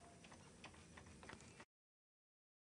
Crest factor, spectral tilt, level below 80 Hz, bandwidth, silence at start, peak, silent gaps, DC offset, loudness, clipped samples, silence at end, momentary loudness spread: 26 dB; -3.5 dB/octave; -76 dBFS; 10.5 kHz; 0 s; -38 dBFS; none; under 0.1%; -61 LUFS; under 0.1%; 1 s; 5 LU